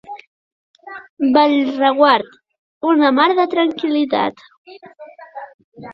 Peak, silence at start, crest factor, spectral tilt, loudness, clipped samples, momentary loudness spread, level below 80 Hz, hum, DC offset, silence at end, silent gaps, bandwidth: 0 dBFS; 0.1 s; 18 dB; -6 dB/octave; -15 LUFS; under 0.1%; 23 LU; -64 dBFS; none; under 0.1%; 0 s; 0.27-0.74 s, 1.09-1.17 s, 2.59-2.81 s, 4.57-4.65 s, 5.54-5.72 s; 6 kHz